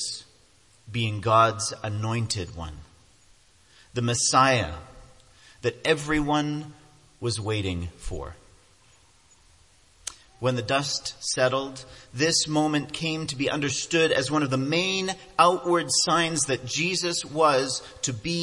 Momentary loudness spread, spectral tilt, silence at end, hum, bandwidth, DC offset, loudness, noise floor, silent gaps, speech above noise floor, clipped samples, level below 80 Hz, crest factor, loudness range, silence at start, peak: 16 LU; -3.5 dB/octave; 0 s; none; 11.5 kHz; under 0.1%; -25 LUFS; -59 dBFS; none; 34 dB; under 0.1%; -50 dBFS; 22 dB; 9 LU; 0 s; -4 dBFS